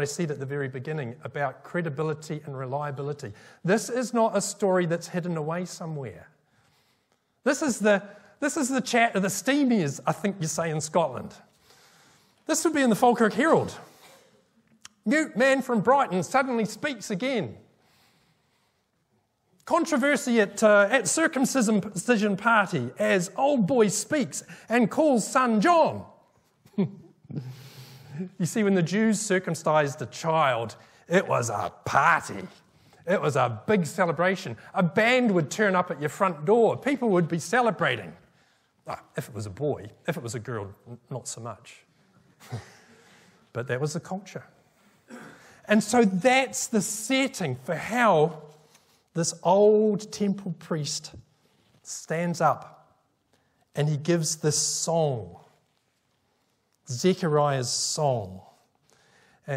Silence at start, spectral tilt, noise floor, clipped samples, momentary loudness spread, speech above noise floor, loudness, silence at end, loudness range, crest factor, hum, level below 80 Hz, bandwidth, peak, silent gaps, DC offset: 0 s; -4.5 dB/octave; -71 dBFS; under 0.1%; 16 LU; 46 dB; -25 LUFS; 0 s; 9 LU; 20 dB; none; -72 dBFS; 16 kHz; -6 dBFS; none; under 0.1%